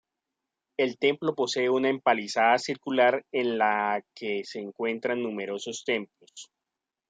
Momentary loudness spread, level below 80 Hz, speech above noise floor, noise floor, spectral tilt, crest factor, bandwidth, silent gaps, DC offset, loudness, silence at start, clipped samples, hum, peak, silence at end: 10 LU; -80 dBFS; 61 dB; -88 dBFS; -4 dB/octave; 20 dB; 9.4 kHz; none; under 0.1%; -27 LUFS; 0.8 s; under 0.1%; none; -8 dBFS; 0.65 s